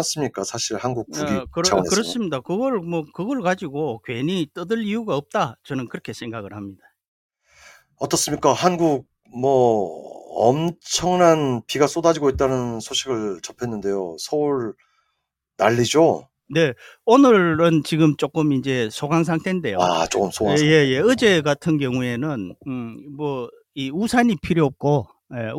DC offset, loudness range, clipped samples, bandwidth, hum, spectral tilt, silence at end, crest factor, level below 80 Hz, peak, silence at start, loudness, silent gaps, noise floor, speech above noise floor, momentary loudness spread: under 0.1%; 8 LU; under 0.1%; 17 kHz; none; -5 dB/octave; 0 s; 18 dB; -52 dBFS; -2 dBFS; 0 s; -21 LUFS; 7.07-7.29 s; -76 dBFS; 56 dB; 14 LU